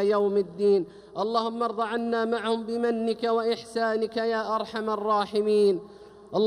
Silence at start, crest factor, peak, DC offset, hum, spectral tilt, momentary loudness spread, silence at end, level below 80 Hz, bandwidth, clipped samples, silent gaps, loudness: 0 s; 14 dB; -12 dBFS; under 0.1%; none; -5.5 dB/octave; 6 LU; 0 s; -68 dBFS; 11 kHz; under 0.1%; none; -26 LUFS